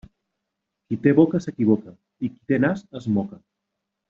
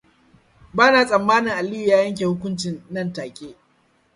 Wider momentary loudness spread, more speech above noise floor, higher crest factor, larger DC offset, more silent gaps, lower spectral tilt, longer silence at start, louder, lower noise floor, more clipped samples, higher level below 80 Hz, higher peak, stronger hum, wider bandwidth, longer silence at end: about the same, 14 LU vs 15 LU; first, 60 dB vs 42 dB; about the same, 20 dB vs 20 dB; neither; neither; first, -8.5 dB/octave vs -5 dB/octave; first, 0.9 s vs 0.75 s; second, -22 LUFS vs -19 LUFS; first, -81 dBFS vs -62 dBFS; neither; about the same, -60 dBFS vs -58 dBFS; about the same, -4 dBFS vs -2 dBFS; neither; second, 7.4 kHz vs 11.5 kHz; about the same, 0.75 s vs 0.65 s